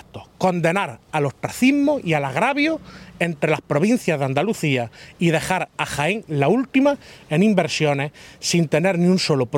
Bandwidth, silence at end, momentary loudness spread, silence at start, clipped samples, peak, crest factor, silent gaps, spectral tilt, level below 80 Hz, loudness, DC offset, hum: 16.5 kHz; 0 s; 7 LU; 0.15 s; under 0.1%; -2 dBFS; 18 dB; none; -5.5 dB/octave; -56 dBFS; -20 LUFS; under 0.1%; none